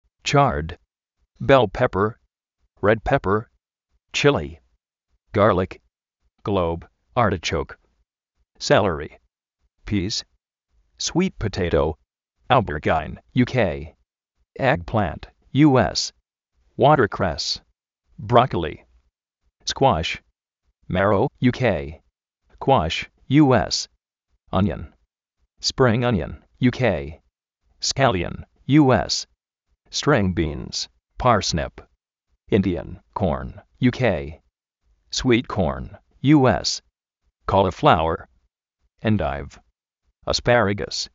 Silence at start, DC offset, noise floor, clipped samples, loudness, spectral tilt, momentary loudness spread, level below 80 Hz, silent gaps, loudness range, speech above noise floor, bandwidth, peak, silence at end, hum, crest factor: 0.25 s; under 0.1%; -73 dBFS; under 0.1%; -21 LUFS; -4.5 dB/octave; 15 LU; -42 dBFS; none; 4 LU; 53 dB; 8 kHz; 0 dBFS; 0.1 s; none; 22 dB